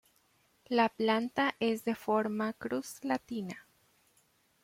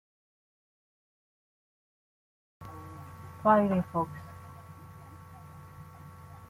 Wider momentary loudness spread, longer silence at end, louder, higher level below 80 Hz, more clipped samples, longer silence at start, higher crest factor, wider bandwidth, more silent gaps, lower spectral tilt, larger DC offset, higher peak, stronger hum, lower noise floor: second, 11 LU vs 25 LU; first, 1.05 s vs 0.15 s; second, -33 LUFS vs -28 LUFS; second, -76 dBFS vs -66 dBFS; neither; second, 0.7 s vs 2.6 s; second, 20 dB vs 26 dB; about the same, 16.5 kHz vs 15.5 kHz; neither; second, -5 dB/octave vs -8.5 dB/octave; neither; second, -14 dBFS vs -10 dBFS; neither; first, -71 dBFS vs -49 dBFS